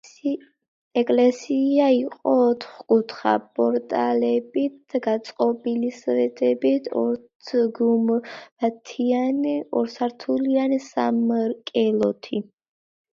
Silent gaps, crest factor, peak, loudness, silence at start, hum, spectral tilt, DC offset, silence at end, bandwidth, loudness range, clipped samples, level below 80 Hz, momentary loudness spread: 0.68-0.91 s, 7.35-7.40 s, 8.52-8.56 s; 16 dB; -6 dBFS; -23 LUFS; 0.05 s; none; -6 dB/octave; under 0.1%; 0.7 s; 7.4 kHz; 3 LU; under 0.1%; -72 dBFS; 8 LU